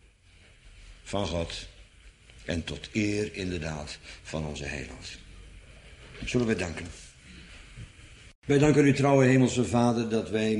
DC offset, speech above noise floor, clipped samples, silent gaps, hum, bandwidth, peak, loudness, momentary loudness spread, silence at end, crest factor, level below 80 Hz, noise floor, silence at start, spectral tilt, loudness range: under 0.1%; 30 dB; under 0.1%; 8.35-8.42 s; none; 11.5 kHz; -8 dBFS; -27 LUFS; 26 LU; 0 s; 20 dB; -48 dBFS; -57 dBFS; 0.65 s; -6 dB/octave; 10 LU